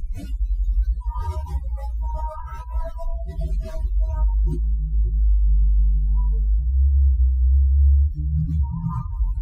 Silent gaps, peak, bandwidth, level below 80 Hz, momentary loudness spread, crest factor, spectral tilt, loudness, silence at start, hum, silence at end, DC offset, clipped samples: none; -10 dBFS; 1.7 kHz; -20 dBFS; 12 LU; 10 dB; -10 dB/octave; -23 LUFS; 0 s; none; 0 s; under 0.1%; under 0.1%